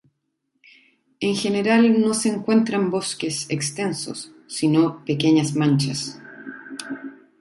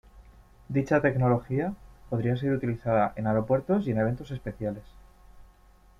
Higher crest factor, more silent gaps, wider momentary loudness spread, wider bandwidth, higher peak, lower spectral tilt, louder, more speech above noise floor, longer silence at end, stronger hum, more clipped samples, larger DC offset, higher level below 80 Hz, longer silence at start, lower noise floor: about the same, 16 dB vs 18 dB; neither; first, 17 LU vs 11 LU; first, 11.5 kHz vs 7.2 kHz; first, -6 dBFS vs -10 dBFS; second, -5 dB/octave vs -9 dB/octave; first, -21 LUFS vs -28 LUFS; first, 54 dB vs 30 dB; second, 0.25 s vs 0.55 s; neither; neither; neither; second, -64 dBFS vs -52 dBFS; first, 1.2 s vs 0.15 s; first, -74 dBFS vs -57 dBFS